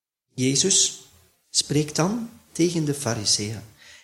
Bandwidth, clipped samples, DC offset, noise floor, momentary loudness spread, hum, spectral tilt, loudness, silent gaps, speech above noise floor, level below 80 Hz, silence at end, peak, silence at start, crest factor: 16.5 kHz; under 0.1%; under 0.1%; -57 dBFS; 17 LU; none; -3 dB/octave; -22 LUFS; none; 34 dB; -60 dBFS; 0.05 s; -6 dBFS; 0.35 s; 20 dB